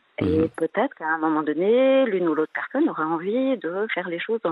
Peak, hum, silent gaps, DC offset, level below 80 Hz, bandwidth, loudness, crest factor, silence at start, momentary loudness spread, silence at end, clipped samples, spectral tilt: -8 dBFS; none; none; under 0.1%; -60 dBFS; 11.5 kHz; -23 LUFS; 14 dB; 0.2 s; 7 LU; 0 s; under 0.1%; -8 dB/octave